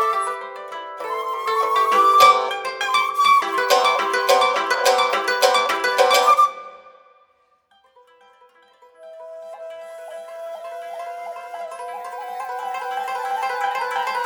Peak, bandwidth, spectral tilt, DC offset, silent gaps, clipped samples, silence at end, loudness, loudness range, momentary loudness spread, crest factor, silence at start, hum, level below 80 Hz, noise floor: 0 dBFS; 19.5 kHz; 0.5 dB/octave; under 0.1%; none; under 0.1%; 0 s; -18 LUFS; 19 LU; 21 LU; 20 dB; 0 s; none; -74 dBFS; -61 dBFS